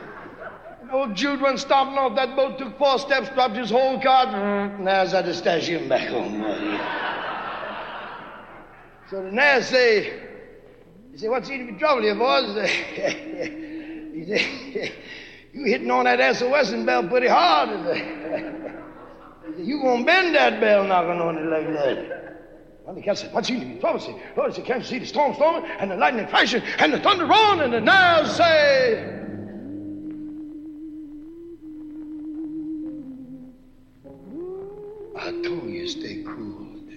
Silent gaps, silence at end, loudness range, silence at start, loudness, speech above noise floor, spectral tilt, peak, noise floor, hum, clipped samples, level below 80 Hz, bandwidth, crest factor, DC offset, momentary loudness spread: none; 0 s; 17 LU; 0 s; -21 LUFS; 29 dB; -4 dB/octave; -4 dBFS; -50 dBFS; none; under 0.1%; -56 dBFS; 8.8 kHz; 18 dB; under 0.1%; 21 LU